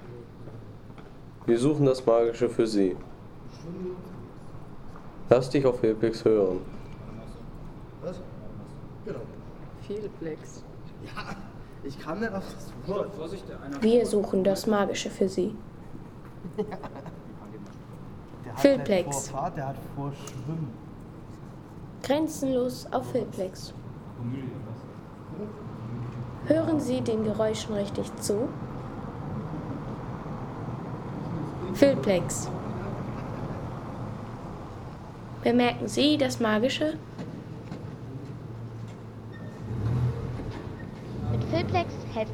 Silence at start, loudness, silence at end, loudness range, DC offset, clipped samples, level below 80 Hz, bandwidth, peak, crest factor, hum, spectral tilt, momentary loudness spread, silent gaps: 0 s; -29 LUFS; 0 s; 10 LU; under 0.1%; under 0.1%; -50 dBFS; 19.5 kHz; -6 dBFS; 24 dB; none; -6 dB/octave; 20 LU; none